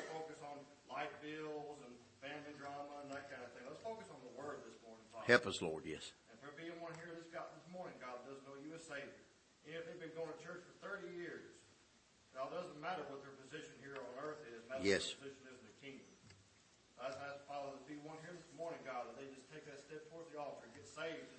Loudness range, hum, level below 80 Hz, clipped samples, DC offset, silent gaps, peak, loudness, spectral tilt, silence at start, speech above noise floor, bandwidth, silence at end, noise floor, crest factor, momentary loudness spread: 10 LU; none; -82 dBFS; under 0.1%; under 0.1%; none; -14 dBFS; -47 LUFS; -4 dB/octave; 0 s; 26 dB; 8.4 kHz; 0 s; -71 dBFS; 34 dB; 13 LU